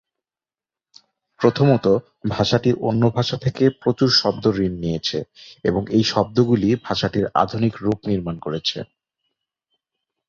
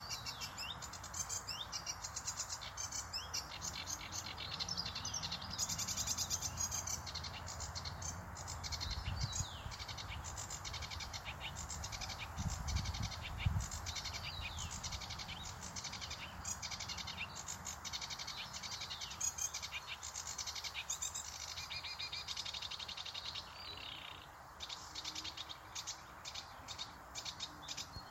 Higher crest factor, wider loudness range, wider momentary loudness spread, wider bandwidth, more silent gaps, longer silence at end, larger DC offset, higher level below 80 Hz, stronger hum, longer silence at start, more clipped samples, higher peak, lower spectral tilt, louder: about the same, 18 dB vs 22 dB; about the same, 4 LU vs 6 LU; about the same, 9 LU vs 7 LU; second, 7.4 kHz vs 16.5 kHz; neither; first, 1.45 s vs 0 s; neither; first, -48 dBFS vs -56 dBFS; neither; first, 1.4 s vs 0 s; neither; first, -2 dBFS vs -24 dBFS; first, -6.5 dB/octave vs -1.5 dB/octave; first, -20 LUFS vs -43 LUFS